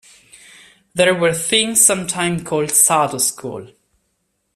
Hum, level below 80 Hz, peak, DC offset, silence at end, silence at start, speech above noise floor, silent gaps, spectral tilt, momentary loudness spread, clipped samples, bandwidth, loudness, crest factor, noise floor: none; -56 dBFS; 0 dBFS; under 0.1%; 0.9 s; 0.95 s; 52 dB; none; -2 dB/octave; 16 LU; under 0.1%; 16 kHz; -15 LUFS; 18 dB; -69 dBFS